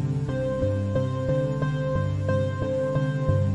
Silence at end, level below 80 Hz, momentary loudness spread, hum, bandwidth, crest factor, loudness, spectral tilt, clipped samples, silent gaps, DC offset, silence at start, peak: 0 s; -44 dBFS; 2 LU; none; 10.5 kHz; 14 dB; -26 LUFS; -8.5 dB/octave; under 0.1%; none; 0.2%; 0 s; -10 dBFS